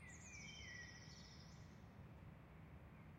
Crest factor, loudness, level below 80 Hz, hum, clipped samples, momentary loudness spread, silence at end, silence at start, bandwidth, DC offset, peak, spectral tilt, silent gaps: 14 dB; -58 LUFS; -68 dBFS; none; under 0.1%; 7 LU; 0 s; 0 s; 16 kHz; under 0.1%; -46 dBFS; -3.5 dB/octave; none